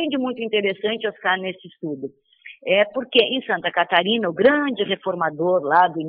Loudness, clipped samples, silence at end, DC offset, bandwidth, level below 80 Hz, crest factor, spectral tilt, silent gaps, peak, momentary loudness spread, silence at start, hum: -20 LUFS; under 0.1%; 0 s; under 0.1%; 5.2 kHz; -68 dBFS; 18 dB; -9 dB/octave; none; -2 dBFS; 14 LU; 0 s; none